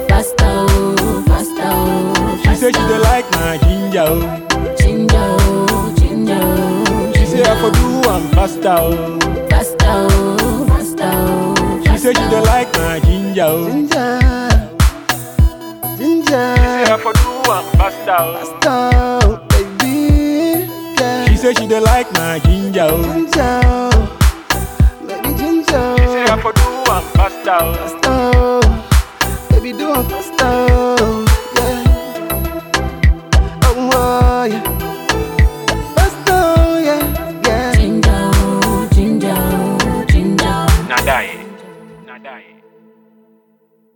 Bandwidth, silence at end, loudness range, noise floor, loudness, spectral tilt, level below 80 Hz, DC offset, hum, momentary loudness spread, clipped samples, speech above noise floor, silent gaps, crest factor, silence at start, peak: 19.5 kHz; 1.55 s; 2 LU; -55 dBFS; -14 LUFS; -5.5 dB/octave; -18 dBFS; under 0.1%; none; 5 LU; under 0.1%; 43 dB; none; 12 dB; 0 s; -2 dBFS